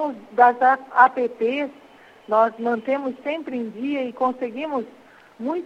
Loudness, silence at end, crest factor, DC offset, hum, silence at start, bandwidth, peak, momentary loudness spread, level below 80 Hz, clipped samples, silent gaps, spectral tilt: -22 LUFS; 0 s; 22 dB; under 0.1%; none; 0 s; 7.6 kHz; 0 dBFS; 12 LU; -72 dBFS; under 0.1%; none; -6 dB/octave